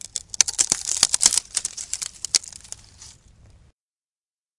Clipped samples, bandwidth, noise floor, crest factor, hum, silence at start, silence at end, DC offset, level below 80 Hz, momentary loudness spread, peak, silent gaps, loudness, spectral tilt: under 0.1%; 12 kHz; under -90 dBFS; 26 dB; none; 0.15 s; 1.45 s; under 0.1%; -56 dBFS; 21 LU; 0 dBFS; none; -20 LUFS; 2 dB/octave